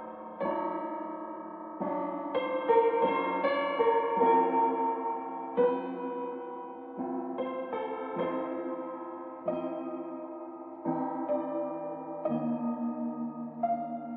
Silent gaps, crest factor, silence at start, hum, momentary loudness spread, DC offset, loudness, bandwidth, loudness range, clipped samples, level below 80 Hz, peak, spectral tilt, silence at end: none; 20 dB; 0 s; none; 14 LU; under 0.1%; -32 LUFS; 4.4 kHz; 8 LU; under 0.1%; -78 dBFS; -12 dBFS; -4.5 dB/octave; 0 s